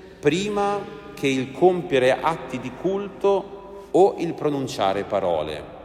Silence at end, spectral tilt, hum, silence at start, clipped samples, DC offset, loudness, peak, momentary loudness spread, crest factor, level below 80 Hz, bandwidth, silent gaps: 0 s; -5.5 dB/octave; none; 0 s; under 0.1%; under 0.1%; -23 LUFS; -4 dBFS; 11 LU; 18 dB; -54 dBFS; 14 kHz; none